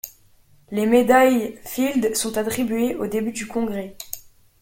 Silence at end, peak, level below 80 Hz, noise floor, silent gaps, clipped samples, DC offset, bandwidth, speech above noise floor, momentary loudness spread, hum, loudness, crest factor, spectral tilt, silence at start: 0.4 s; -4 dBFS; -54 dBFS; -54 dBFS; none; under 0.1%; under 0.1%; 17 kHz; 34 dB; 18 LU; none; -21 LUFS; 18 dB; -4 dB/octave; 0.05 s